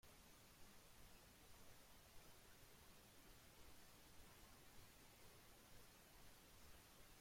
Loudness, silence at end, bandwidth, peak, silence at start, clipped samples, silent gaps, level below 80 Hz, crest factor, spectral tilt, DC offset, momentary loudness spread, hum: -67 LUFS; 0 s; 16.5 kHz; -50 dBFS; 0.05 s; under 0.1%; none; -74 dBFS; 16 dB; -3 dB/octave; under 0.1%; 1 LU; none